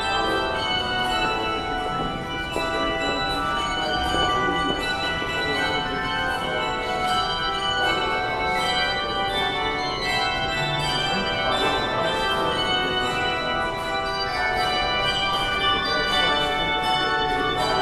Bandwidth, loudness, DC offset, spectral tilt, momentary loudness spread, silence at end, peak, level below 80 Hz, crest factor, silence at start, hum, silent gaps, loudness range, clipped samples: 15.5 kHz; -23 LUFS; under 0.1%; -3.5 dB/octave; 4 LU; 0 s; -8 dBFS; -40 dBFS; 14 dB; 0 s; none; none; 2 LU; under 0.1%